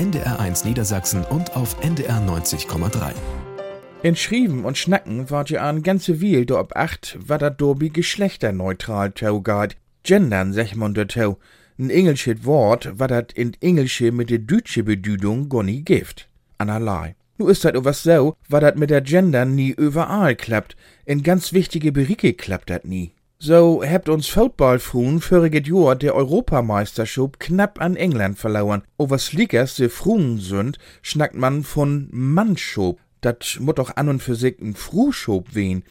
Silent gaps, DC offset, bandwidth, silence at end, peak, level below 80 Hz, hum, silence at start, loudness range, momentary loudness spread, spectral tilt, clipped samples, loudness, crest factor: none; under 0.1%; 17 kHz; 0.1 s; 0 dBFS; -40 dBFS; none; 0 s; 5 LU; 9 LU; -6 dB/octave; under 0.1%; -19 LUFS; 18 dB